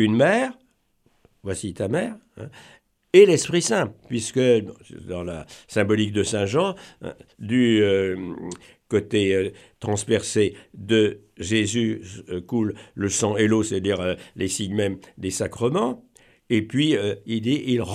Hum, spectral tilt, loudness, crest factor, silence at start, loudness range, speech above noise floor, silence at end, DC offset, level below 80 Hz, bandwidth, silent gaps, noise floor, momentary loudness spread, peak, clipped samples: none; -5 dB/octave; -22 LUFS; 20 dB; 0 s; 4 LU; 42 dB; 0 s; under 0.1%; -58 dBFS; 14 kHz; none; -65 dBFS; 17 LU; -2 dBFS; under 0.1%